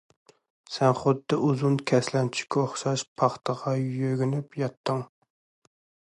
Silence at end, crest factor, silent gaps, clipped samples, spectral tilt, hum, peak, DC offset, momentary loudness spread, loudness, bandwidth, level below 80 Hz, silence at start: 1.1 s; 20 dB; 3.08-3.16 s, 4.77-4.84 s; under 0.1%; -6 dB/octave; none; -8 dBFS; under 0.1%; 7 LU; -27 LUFS; 11 kHz; -68 dBFS; 0.7 s